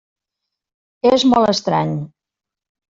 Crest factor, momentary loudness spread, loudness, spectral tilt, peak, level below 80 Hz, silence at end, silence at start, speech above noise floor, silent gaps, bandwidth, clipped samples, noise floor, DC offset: 16 dB; 13 LU; -16 LUFS; -5.5 dB/octave; -2 dBFS; -56 dBFS; 0.85 s; 1.05 s; 71 dB; none; 7.8 kHz; under 0.1%; -86 dBFS; under 0.1%